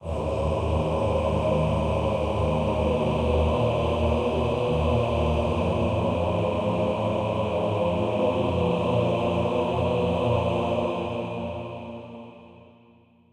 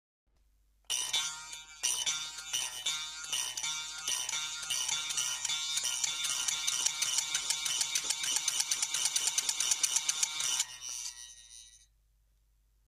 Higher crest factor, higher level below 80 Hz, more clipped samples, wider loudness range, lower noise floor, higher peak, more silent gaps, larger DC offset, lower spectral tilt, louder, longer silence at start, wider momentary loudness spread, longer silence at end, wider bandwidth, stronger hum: second, 14 dB vs 24 dB; first, -36 dBFS vs -70 dBFS; neither; about the same, 3 LU vs 4 LU; second, -56 dBFS vs -70 dBFS; about the same, -10 dBFS vs -10 dBFS; neither; neither; first, -8 dB/octave vs 3.5 dB/octave; first, -25 LUFS vs -31 LUFS; second, 0 s vs 0.9 s; about the same, 6 LU vs 8 LU; second, 0.8 s vs 1.1 s; second, 10 kHz vs 15.5 kHz; neither